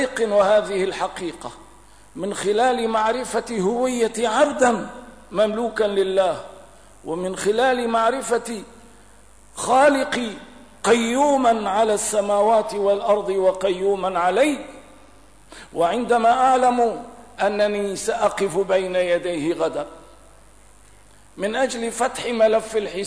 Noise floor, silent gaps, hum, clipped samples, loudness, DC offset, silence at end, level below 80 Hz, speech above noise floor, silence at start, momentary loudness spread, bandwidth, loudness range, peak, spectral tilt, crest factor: -51 dBFS; none; none; under 0.1%; -20 LUFS; 0.3%; 0 s; -54 dBFS; 31 dB; 0 s; 14 LU; 11 kHz; 5 LU; -6 dBFS; -3.5 dB/octave; 16 dB